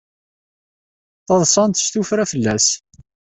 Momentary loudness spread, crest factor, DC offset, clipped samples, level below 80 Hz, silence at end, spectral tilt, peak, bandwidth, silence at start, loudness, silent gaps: 5 LU; 18 dB; under 0.1%; under 0.1%; -54 dBFS; 0.6 s; -3.5 dB/octave; -2 dBFS; 8.6 kHz; 1.3 s; -16 LUFS; none